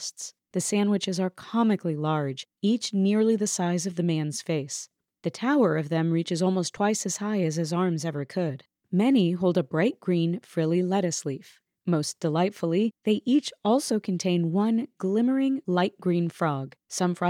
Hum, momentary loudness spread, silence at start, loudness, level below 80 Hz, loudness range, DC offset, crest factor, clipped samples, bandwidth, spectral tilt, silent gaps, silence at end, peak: none; 8 LU; 0 s; -26 LUFS; -78 dBFS; 2 LU; under 0.1%; 14 dB; under 0.1%; 15.5 kHz; -5.5 dB/octave; none; 0 s; -12 dBFS